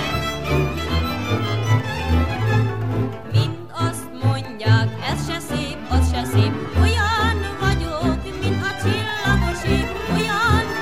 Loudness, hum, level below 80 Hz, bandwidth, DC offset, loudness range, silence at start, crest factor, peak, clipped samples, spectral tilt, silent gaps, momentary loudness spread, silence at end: -21 LUFS; none; -30 dBFS; 15.5 kHz; 1%; 2 LU; 0 s; 16 dB; -4 dBFS; under 0.1%; -6 dB/octave; none; 6 LU; 0 s